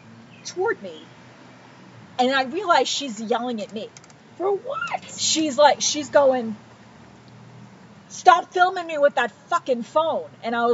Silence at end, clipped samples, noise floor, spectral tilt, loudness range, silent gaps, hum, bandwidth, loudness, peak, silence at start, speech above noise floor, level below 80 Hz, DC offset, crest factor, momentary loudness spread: 0 s; under 0.1%; -47 dBFS; -2 dB/octave; 3 LU; none; none; 8 kHz; -21 LUFS; 0 dBFS; 0.1 s; 26 dB; -72 dBFS; under 0.1%; 22 dB; 18 LU